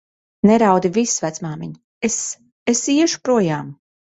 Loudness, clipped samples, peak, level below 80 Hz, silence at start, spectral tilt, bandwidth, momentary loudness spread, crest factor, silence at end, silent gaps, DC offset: -18 LUFS; under 0.1%; -2 dBFS; -58 dBFS; 0.45 s; -4.5 dB/octave; 8.4 kHz; 14 LU; 16 dB; 0.4 s; 1.84-2.01 s, 2.52-2.66 s; under 0.1%